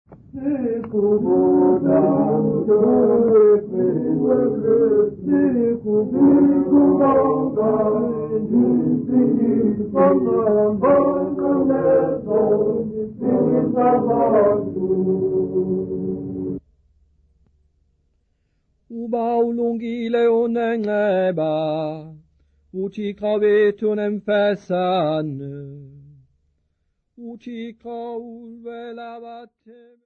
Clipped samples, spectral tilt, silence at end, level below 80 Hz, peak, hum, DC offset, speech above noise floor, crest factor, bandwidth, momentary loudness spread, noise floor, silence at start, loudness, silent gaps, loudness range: under 0.1%; -10 dB/octave; 0.6 s; -54 dBFS; -6 dBFS; none; under 0.1%; 52 dB; 14 dB; 4.3 kHz; 17 LU; -70 dBFS; 0.1 s; -19 LUFS; none; 14 LU